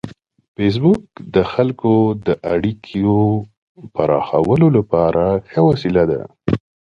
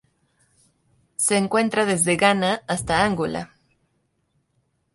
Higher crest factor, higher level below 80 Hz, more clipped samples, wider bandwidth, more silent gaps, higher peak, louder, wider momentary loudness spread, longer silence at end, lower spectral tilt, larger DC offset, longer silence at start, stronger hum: about the same, 16 dB vs 20 dB; first, -42 dBFS vs -52 dBFS; neither; second, 7.2 kHz vs 12 kHz; first, 0.48-0.55 s, 3.57-3.75 s vs none; first, 0 dBFS vs -4 dBFS; first, -17 LUFS vs -21 LUFS; second, 8 LU vs 12 LU; second, 0.35 s vs 1.5 s; first, -9.5 dB/octave vs -3.5 dB/octave; neither; second, 0.05 s vs 1.2 s; neither